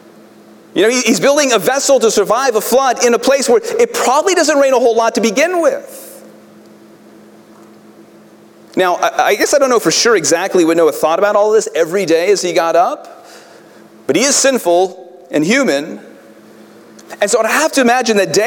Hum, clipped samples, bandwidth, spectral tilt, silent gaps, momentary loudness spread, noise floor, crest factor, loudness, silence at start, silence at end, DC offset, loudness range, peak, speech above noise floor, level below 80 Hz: none; under 0.1%; 18 kHz; -2.5 dB/octave; none; 7 LU; -42 dBFS; 14 dB; -12 LUFS; 0.75 s; 0 s; under 0.1%; 7 LU; 0 dBFS; 29 dB; -60 dBFS